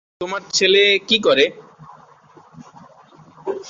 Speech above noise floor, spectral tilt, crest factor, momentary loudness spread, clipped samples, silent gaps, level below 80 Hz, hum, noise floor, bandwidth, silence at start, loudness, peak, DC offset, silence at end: 32 dB; -2 dB/octave; 18 dB; 15 LU; under 0.1%; none; -64 dBFS; none; -48 dBFS; 7.8 kHz; 0.2 s; -15 LUFS; -2 dBFS; under 0.1%; 0 s